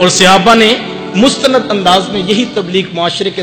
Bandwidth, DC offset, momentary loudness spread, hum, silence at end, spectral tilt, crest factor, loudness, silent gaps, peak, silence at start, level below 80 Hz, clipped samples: over 20 kHz; under 0.1%; 9 LU; none; 0 s; -3.5 dB/octave; 10 dB; -9 LUFS; none; 0 dBFS; 0 s; -42 dBFS; 1%